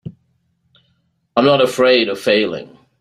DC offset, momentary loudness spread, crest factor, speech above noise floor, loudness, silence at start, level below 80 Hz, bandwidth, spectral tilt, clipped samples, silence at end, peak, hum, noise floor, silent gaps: under 0.1%; 13 LU; 16 dB; 50 dB; -15 LUFS; 0.05 s; -60 dBFS; 15 kHz; -4.5 dB/octave; under 0.1%; 0.35 s; 0 dBFS; none; -64 dBFS; none